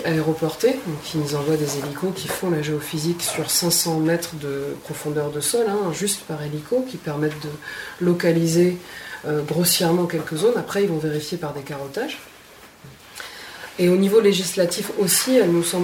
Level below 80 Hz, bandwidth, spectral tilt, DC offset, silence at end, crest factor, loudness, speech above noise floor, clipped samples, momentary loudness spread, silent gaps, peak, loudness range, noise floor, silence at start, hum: -58 dBFS; 19 kHz; -4.5 dB/octave; under 0.1%; 0 s; 16 dB; -21 LUFS; 24 dB; under 0.1%; 14 LU; none; -6 dBFS; 4 LU; -46 dBFS; 0 s; none